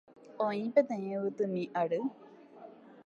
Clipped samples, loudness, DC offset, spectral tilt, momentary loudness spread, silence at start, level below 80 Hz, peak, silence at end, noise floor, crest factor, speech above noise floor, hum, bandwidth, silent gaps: under 0.1%; -33 LUFS; under 0.1%; -8 dB/octave; 24 LU; 0.25 s; -86 dBFS; -12 dBFS; 0.05 s; -53 dBFS; 22 dB; 21 dB; none; 7.2 kHz; none